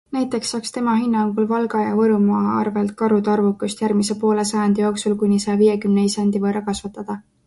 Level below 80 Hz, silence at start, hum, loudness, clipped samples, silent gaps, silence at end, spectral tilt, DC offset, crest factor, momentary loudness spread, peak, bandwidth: -56 dBFS; 0.1 s; none; -19 LUFS; under 0.1%; none; 0.25 s; -6 dB/octave; under 0.1%; 14 dB; 7 LU; -6 dBFS; 11.5 kHz